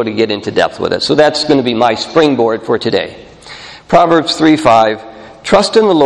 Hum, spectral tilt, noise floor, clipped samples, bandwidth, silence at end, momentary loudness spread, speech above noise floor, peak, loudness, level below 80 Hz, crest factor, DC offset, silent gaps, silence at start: none; -5 dB/octave; -32 dBFS; 0.3%; 11 kHz; 0 s; 16 LU; 22 dB; 0 dBFS; -11 LUFS; -44 dBFS; 12 dB; under 0.1%; none; 0 s